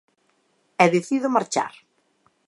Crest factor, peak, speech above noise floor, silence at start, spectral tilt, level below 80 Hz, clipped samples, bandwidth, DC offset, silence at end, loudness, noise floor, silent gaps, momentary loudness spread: 22 dB; -2 dBFS; 46 dB; 0.8 s; -5 dB/octave; -76 dBFS; under 0.1%; 11.5 kHz; under 0.1%; 0.75 s; -22 LUFS; -67 dBFS; none; 13 LU